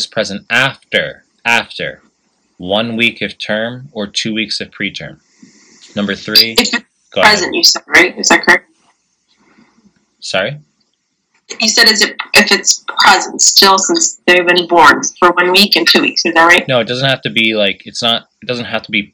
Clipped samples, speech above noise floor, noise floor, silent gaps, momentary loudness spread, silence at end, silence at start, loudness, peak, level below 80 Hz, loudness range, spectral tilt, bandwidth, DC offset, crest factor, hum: 0.6%; 53 dB; -65 dBFS; none; 13 LU; 0.1 s; 0 s; -10 LUFS; 0 dBFS; -52 dBFS; 9 LU; -1.5 dB/octave; over 20 kHz; under 0.1%; 14 dB; none